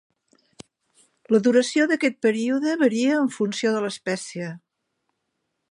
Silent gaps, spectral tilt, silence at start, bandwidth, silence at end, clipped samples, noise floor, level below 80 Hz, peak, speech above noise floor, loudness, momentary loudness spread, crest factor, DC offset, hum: none; -4.5 dB/octave; 1.3 s; 11.5 kHz; 1.15 s; under 0.1%; -77 dBFS; -76 dBFS; -6 dBFS; 56 dB; -22 LUFS; 10 LU; 18 dB; under 0.1%; none